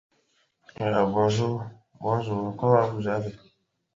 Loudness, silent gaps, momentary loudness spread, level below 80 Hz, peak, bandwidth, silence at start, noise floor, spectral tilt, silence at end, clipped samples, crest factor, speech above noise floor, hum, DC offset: -26 LUFS; none; 12 LU; -60 dBFS; -6 dBFS; 7.6 kHz; 0.8 s; -69 dBFS; -7 dB/octave; 0.6 s; under 0.1%; 22 dB; 44 dB; none; under 0.1%